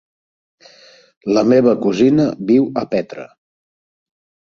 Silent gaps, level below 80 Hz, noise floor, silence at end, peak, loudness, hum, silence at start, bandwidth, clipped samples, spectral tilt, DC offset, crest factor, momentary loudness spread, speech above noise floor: none; -58 dBFS; -47 dBFS; 1.25 s; -2 dBFS; -15 LUFS; none; 1.25 s; 7.4 kHz; under 0.1%; -7 dB/octave; under 0.1%; 16 dB; 15 LU; 32 dB